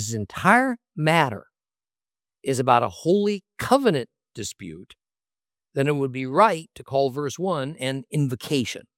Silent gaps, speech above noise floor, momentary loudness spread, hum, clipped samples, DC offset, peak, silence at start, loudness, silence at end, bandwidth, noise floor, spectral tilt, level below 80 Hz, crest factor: none; over 67 dB; 14 LU; none; under 0.1%; under 0.1%; -2 dBFS; 0 s; -23 LUFS; 0.15 s; 16.5 kHz; under -90 dBFS; -5.5 dB/octave; -62 dBFS; 22 dB